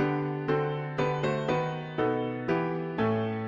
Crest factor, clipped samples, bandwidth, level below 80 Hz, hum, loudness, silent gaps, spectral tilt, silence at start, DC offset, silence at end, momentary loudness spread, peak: 14 dB; under 0.1%; 7.4 kHz; -58 dBFS; none; -30 LUFS; none; -8 dB/octave; 0 s; under 0.1%; 0 s; 3 LU; -16 dBFS